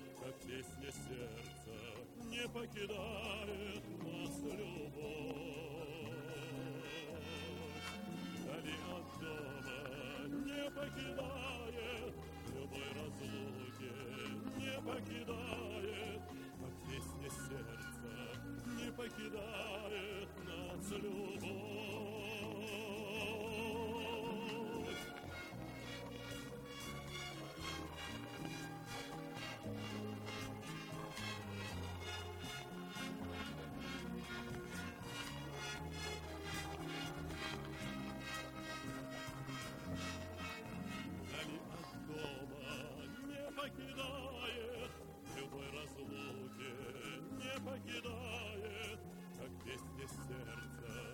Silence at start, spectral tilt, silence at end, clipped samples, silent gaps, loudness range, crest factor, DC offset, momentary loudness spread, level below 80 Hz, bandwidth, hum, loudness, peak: 0 s; -4.5 dB/octave; 0 s; under 0.1%; none; 3 LU; 20 dB; under 0.1%; 5 LU; -62 dBFS; 18 kHz; none; -47 LUFS; -26 dBFS